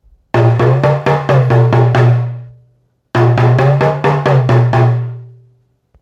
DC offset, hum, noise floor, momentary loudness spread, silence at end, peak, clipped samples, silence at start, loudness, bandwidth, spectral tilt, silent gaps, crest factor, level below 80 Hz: under 0.1%; none; -55 dBFS; 9 LU; 0.75 s; 0 dBFS; under 0.1%; 0.35 s; -11 LUFS; 6.8 kHz; -8.5 dB/octave; none; 12 dB; -44 dBFS